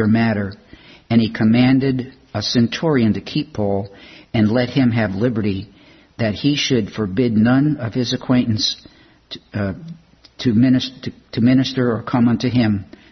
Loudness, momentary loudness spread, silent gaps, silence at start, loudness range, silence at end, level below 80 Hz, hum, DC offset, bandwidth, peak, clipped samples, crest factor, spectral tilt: -18 LUFS; 12 LU; none; 0 s; 2 LU; 0.25 s; -50 dBFS; none; under 0.1%; 6.4 kHz; -2 dBFS; under 0.1%; 16 dB; -6.5 dB/octave